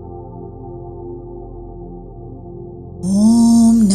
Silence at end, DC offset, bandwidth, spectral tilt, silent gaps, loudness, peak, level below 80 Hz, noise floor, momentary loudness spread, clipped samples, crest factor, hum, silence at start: 0 s; under 0.1%; 12 kHz; -6.5 dB/octave; none; -12 LUFS; -2 dBFS; -38 dBFS; -33 dBFS; 24 LU; under 0.1%; 14 dB; none; 0 s